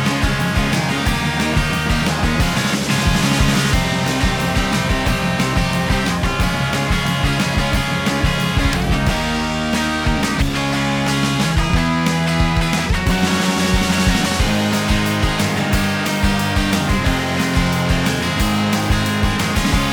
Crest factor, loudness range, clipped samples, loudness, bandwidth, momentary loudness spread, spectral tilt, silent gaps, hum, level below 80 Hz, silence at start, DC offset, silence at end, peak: 14 dB; 1 LU; under 0.1%; -17 LUFS; over 20 kHz; 2 LU; -4.5 dB/octave; none; none; -24 dBFS; 0 s; under 0.1%; 0 s; -2 dBFS